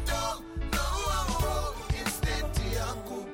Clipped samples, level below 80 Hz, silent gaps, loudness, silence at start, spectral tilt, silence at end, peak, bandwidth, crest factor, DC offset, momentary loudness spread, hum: under 0.1%; -34 dBFS; none; -31 LUFS; 0 s; -4 dB/octave; 0 s; -14 dBFS; 17 kHz; 16 dB; under 0.1%; 4 LU; none